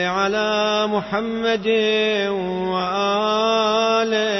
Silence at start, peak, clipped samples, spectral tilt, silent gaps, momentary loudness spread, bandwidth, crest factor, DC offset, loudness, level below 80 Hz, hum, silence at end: 0 s; -6 dBFS; under 0.1%; -4 dB/octave; none; 5 LU; 6.2 kHz; 14 dB; under 0.1%; -19 LUFS; -56 dBFS; none; 0 s